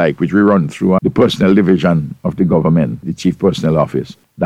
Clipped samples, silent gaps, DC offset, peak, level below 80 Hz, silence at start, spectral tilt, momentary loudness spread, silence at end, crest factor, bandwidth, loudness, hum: under 0.1%; none; under 0.1%; 0 dBFS; -42 dBFS; 0 s; -7.5 dB/octave; 7 LU; 0 s; 14 dB; 11 kHz; -14 LUFS; none